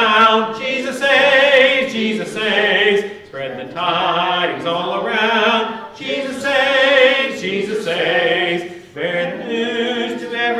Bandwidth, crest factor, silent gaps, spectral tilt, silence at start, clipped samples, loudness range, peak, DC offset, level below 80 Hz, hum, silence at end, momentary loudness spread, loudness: 13 kHz; 16 dB; none; -3.5 dB/octave; 0 s; under 0.1%; 4 LU; -2 dBFS; under 0.1%; -60 dBFS; none; 0 s; 12 LU; -15 LUFS